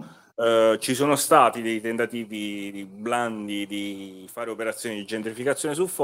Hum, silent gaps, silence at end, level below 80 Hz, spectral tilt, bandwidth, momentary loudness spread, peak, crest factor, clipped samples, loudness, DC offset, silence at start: none; none; 0 s; -72 dBFS; -3.5 dB/octave; 16 kHz; 16 LU; -2 dBFS; 22 dB; under 0.1%; -24 LUFS; under 0.1%; 0 s